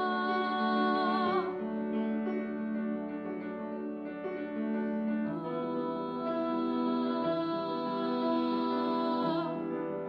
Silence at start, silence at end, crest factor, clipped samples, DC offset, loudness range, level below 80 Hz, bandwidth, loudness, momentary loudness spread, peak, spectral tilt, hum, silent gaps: 0 s; 0 s; 14 dB; under 0.1%; under 0.1%; 4 LU; -72 dBFS; 5.6 kHz; -33 LUFS; 9 LU; -18 dBFS; -8 dB/octave; none; none